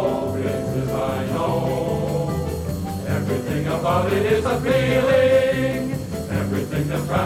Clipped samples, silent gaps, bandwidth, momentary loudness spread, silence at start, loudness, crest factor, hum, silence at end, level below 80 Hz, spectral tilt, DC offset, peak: under 0.1%; none; 16.5 kHz; 9 LU; 0 s; -21 LUFS; 14 dB; none; 0 s; -40 dBFS; -6.5 dB/octave; under 0.1%; -6 dBFS